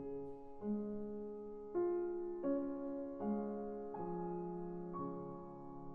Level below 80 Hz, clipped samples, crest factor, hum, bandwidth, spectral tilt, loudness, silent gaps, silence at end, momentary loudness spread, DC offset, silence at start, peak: -66 dBFS; under 0.1%; 16 dB; none; 2.7 kHz; -11 dB/octave; -44 LUFS; none; 0 s; 10 LU; under 0.1%; 0 s; -26 dBFS